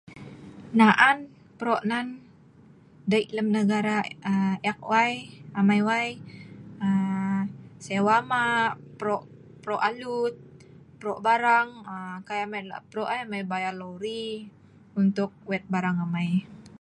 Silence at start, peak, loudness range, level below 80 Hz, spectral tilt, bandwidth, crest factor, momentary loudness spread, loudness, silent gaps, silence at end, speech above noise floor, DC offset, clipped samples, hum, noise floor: 0.1 s; -4 dBFS; 5 LU; -68 dBFS; -6 dB/octave; 10.5 kHz; 24 dB; 16 LU; -26 LUFS; none; 0.1 s; 28 dB; under 0.1%; under 0.1%; none; -53 dBFS